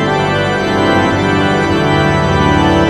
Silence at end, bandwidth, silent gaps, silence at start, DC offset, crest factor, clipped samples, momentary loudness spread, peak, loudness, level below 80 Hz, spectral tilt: 0 s; 12.5 kHz; none; 0 s; under 0.1%; 12 dB; under 0.1%; 2 LU; 0 dBFS; -12 LUFS; -30 dBFS; -6 dB/octave